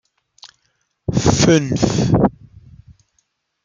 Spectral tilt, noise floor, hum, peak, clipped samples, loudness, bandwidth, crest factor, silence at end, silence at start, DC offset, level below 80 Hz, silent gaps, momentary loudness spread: -5.5 dB/octave; -67 dBFS; none; -2 dBFS; under 0.1%; -16 LUFS; 9.4 kHz; 18 dB; 1.35 s; 0.45 s; under 0.1%; -38 dBFS; none; 8 LU